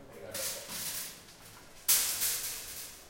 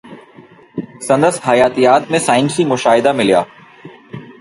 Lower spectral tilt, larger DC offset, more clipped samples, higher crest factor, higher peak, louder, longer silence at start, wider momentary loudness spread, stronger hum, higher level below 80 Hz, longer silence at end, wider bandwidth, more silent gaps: second, 0.5 dB/octave vs -4.5 dB/octave; neither; neither; first, 24 dB vs 14 dB; second, -12 dBFS vs 0 dBFS; second, -32 LUFS vs -13 LUFS; about the same, 0 s vs 0.05 s; first, 24 LU vs 18 LU; neither; second, -64 dBFS vs -56 dBFS; about the same, 0 s vs 0.1 s; first, 16.5 kHz vs 11.5 kHz; neither